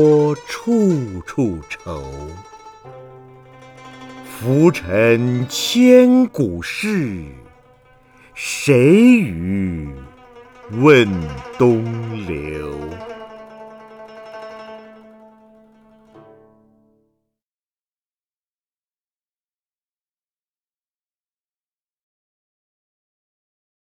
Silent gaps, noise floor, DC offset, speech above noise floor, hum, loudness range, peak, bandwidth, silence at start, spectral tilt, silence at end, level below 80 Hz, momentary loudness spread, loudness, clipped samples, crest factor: none; under -90 dBFS; under 0.1%; over 74 dB; none; 16 LU; 0 dBFS; 17.5 kHz; 0 s; -6 dB/octave; 9.1 s; -46 dBFS; 26 LU; -16 LUFS; under 0.1%; 20 dB